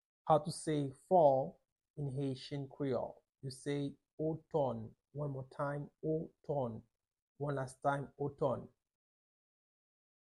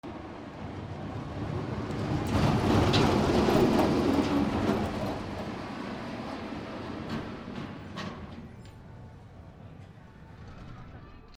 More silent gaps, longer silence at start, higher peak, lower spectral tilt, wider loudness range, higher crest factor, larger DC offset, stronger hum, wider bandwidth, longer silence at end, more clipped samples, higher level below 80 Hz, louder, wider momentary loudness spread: first, 1.72-1.76 s, 1.90-1.94 s, 4.13-4.18 s, 7.22-7.35 s vs none; first, 0.25 s vs 0.05 s; second, -16 dBFS vs -10 dBFS; about the same, -7 dB/octave vs -6.5 dB/octave; second, 6 LU vs 18 LU; about the same, 22 dB vs 20 dB; neither; neither; second, 11.5 kHz vs 19.5 kHz; first, 1.6 s vs 0 s; neither; second, -72 dBFS vs -46 dBFS; second, -38 LUFS vs -30 LUFS; second, 12 LU vs 24 LU